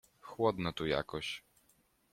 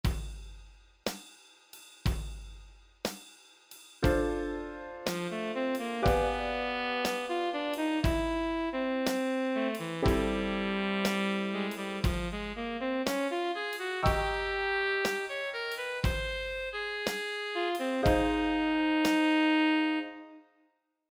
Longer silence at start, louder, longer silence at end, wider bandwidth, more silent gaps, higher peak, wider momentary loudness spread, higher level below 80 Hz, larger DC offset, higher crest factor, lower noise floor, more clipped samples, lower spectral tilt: first, 0.25 s vs 0.05 s; second, -36 LUFS vs -31 LUFS; about the same, 0.75 s vs 0.7 s; second, 16 kHz vs over 20 kHz; neither; second, -16 dBFS vs -12 dBFS; about the same, 12 LU vs 12 LU; second, -62 dBFS vs -42 dBFS; neither; about the same, 22 dB vs 20 dB; about the same, -72 dBFS vs -73 dBFS; neither; about the same, -5.5 dB/octave vs -5 dB/octave